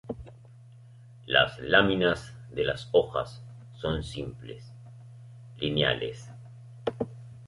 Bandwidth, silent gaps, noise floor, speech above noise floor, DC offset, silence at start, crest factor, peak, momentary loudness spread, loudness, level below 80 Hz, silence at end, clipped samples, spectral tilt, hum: 11.5 kHz; none; -51 dBFS; 23 dB; under 0.1%; 0.05 s; 24 dB; -6 dBFS; 26 LU; -28 LUFS; -52 dBFS; 0 s; under 0.1%; -5.5 dB/octave; none